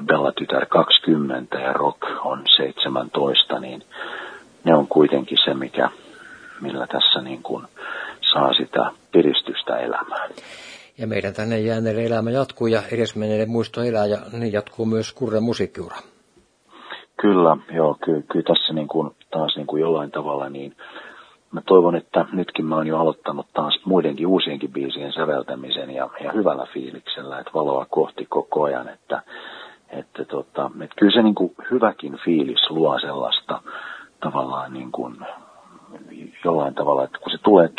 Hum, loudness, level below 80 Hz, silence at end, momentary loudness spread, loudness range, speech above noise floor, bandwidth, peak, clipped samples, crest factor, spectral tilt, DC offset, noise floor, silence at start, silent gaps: none; -21 LUFS; -66 dBFS; 0.1 s; 17 LU; 6 LU; 37 dB; 10.5 kHz; 0 dBFS; under 0.1%; 22 dB; -6 dB/octave; under 0.1%; -58 dBFS; 0 s; none